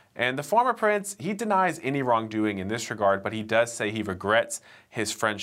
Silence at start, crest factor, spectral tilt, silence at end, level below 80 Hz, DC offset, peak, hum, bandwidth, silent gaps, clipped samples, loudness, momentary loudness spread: 0.15 s; 18 dB; -4 dB/octave; 0 s; -70 dBFS; under 0.1%; -8 dBFS; none; 16 kHz; none; under 0.1%; -26 LUFS; 7 LU